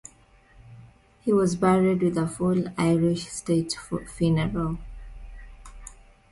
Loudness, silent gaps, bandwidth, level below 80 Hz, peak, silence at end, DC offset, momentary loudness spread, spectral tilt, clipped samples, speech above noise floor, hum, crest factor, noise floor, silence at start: -25 LUFS; none; 11.5 kHz; -46 dBFS; -10 dBFS; 0.4 s; under 0.1%; 24 LU; -6.5 dB/octave; under 0.1%; 32 dB; none; 16 dB; -56 dBFS; 0.65 s